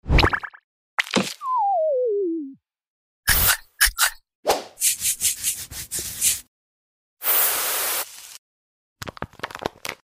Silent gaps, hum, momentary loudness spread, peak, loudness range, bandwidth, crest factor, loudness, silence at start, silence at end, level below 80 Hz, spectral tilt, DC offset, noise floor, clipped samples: 0.64-0.98 s, 2.88-3.23 s, 4.35-4.43 s, 6.48-7.17 s, 8.38-8.96 s; none; 16 LU; -2 dBFS; 3 LU; 16 kHz; 22 dB; -21 LUFS; 0.05 s; 0.1 s; -36 dBFS; -2 dB/octave; under 0.1%; under -90 dBFS; under 0.1%